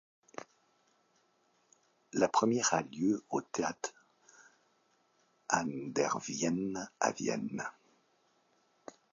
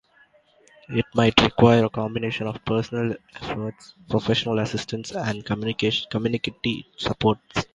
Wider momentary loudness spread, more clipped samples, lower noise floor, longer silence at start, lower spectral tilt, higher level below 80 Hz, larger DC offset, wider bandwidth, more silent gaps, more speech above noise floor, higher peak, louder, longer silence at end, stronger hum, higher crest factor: first, 21 LU vs 12 LU; neither; first, -73 dBFS vs -58 dBFS; second, 0.4 s vs 0.9 s; second, -4 dB/octave vs -6 dB/octave; second, -76 dBFS vs -48 dBFS; neither; second, 7.4 kHz vs 9.2 kHz; neither; first, 40 dB vs 35 dB; second, -14 dBFS vs 0 dBFS; second, -34 LUFS vs -23 LUFS; first, 1.4 s vs 0.1 s; neither; about the same, 24 dB vs 24 dB